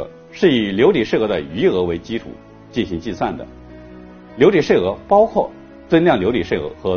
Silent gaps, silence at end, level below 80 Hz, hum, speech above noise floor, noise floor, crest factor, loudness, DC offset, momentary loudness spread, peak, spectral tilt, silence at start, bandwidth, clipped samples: none; 0 s; -44 dBFS; none; 22 dB; -38 dBFS; 18 dB; -17 LUFS; under 0.1%; 13 LU; 0 dBFS; -5 dB/octave; 0 s; 6.8 kHz; under 0.1%